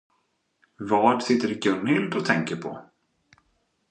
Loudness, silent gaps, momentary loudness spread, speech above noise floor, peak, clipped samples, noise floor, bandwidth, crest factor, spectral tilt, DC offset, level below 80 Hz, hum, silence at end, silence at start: -24 LUFS; none; 16 LU; 48 dB; -4 dBFS; under 0.1%; -72 dBFS; 9.4 kHz; 22 dB; -5.5 dB/octave; under 0.1%; -70 dBFS; none; 1.1 s; 0.8 s